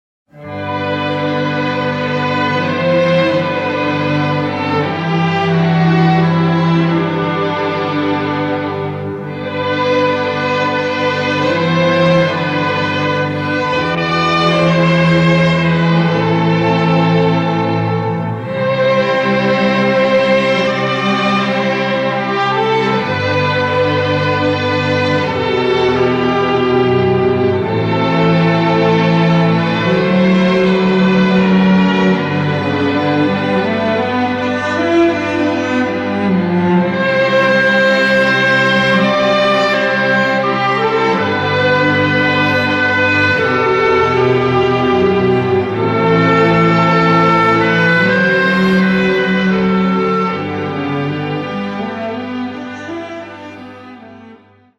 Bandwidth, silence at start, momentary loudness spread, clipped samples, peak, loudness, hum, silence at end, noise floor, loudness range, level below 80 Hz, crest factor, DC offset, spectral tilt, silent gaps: 8.2 kHz; 0.35 s; 7 LU; under 0.1%; -2 dBFS; -13 LUFS; none; 0.45 s; -43 dBFS; 5 LU; -46 dBFS; 12 dB; under 0.1%; -7 dB/octave; none